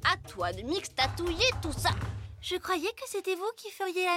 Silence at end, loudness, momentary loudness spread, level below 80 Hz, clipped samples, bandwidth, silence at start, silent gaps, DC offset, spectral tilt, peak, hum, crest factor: 0 s; -31 LUFS; 9 LU; -46 dBFS; under 0.1%; 16.5 kHz; 0 s; none; under 0.1%; -4 dB/octave; -10 dBFS; none; 20 dB